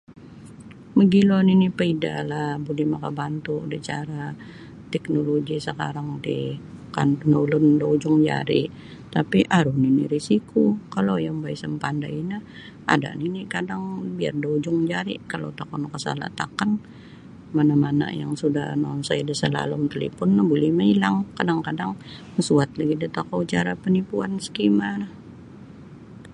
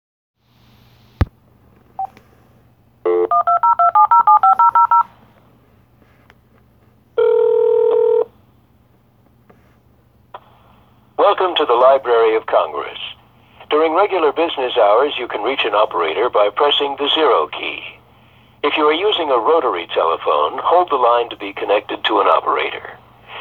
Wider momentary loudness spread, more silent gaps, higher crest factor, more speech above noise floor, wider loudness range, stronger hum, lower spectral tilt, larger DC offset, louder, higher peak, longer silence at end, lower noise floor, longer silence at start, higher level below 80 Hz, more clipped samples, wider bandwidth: about the same, 13 LU vs 13 LU; neither; first, 22 dB vs 16 dB; second, 21 dB vs 37 dB; about the same, 6 LU vs 7 LU; neither; about the same, -6.5 dB/octave vs -6.5 dB/octave; neither; second, -23 LUFS vs -15 LUFS; about the same, -2 dBFS vs 0 dBFS; about the same, 0 s vs 0 s; second, -43 dBFS vs -53 dBFS; second, 0.1 s vs 1.2 s; second, -56 dBFS vs -44 dBFS; neither; first, 11 kHz vs 4.6 kHz